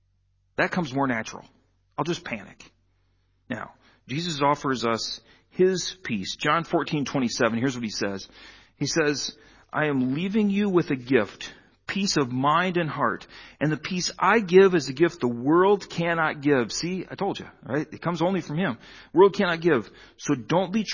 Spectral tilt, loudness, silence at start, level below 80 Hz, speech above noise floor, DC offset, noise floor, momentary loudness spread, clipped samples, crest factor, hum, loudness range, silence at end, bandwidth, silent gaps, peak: -5 dB/octave; -24 LUFS; 0.6 s; -60 dBFS; 43 dB; under 0.1%; -68 dBFS; 15 LU; under 0.1%; 20 dB; none; 8 LU; 0 s; 7.4 kHz; none; -4 dBFS